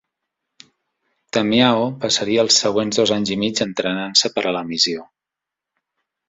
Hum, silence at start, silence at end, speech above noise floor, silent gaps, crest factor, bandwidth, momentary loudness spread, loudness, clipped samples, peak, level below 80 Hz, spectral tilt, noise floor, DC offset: none; 1.35 s; 1.25 s; 67 dB; none; 20 dB; 8.2 kHz; 7 LU; -18 LUFS; under 0.1%; -2 dBFS; -60 dBFS; -3 dB/octave; -86 dBFS; under 0.1%